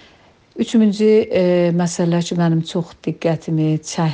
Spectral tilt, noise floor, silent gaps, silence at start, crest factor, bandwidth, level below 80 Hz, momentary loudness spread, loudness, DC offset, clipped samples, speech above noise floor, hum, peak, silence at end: -6.5 dB/octave; -50 dBFS; none; 0.55 s; 12 dB; 9.6 kHz; -58 dBFS; 9 LU; -17 LUFS; under 0.1%; under 0.1%; 34 dB; none; -4 dBFS; 0 s